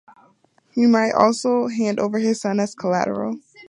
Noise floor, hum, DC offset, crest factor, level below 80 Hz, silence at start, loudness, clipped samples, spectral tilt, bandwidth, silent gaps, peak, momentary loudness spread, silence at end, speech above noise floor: -59 dBFS; none; under 0.1%; 20 dB; -66 dBFS; 0.75 s; -20 LUFS; under 0.1%; -5.5 dB/octave; 11 kHz; none; 0 dBFS; 8 LU; 0.05 s; 40 dB